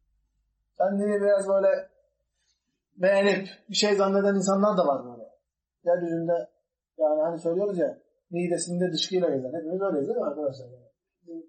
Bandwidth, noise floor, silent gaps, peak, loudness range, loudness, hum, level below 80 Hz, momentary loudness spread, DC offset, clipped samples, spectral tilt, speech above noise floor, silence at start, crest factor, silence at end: 8.8 kHz; -75 dBFS; none; -10 dBFS; 4 LU; -26 LUFS; none; -78 dBFS; 10 LU; under 0.1%; under 0.1%; -5 dB/octave; 50 dB; 0.8 s; 18 dB; 0.05 s